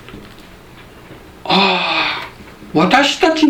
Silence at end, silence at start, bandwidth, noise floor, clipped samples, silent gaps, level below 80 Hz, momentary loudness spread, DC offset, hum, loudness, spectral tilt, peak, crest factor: 0 s; 0.05 s; 15 kHz; -39 dBFS; under 0.1%; none; -46 dBFS; 20 LU; under 0.1%; none; -14 LUFS; -4 dB/octave; 0 dBFS; 16 dB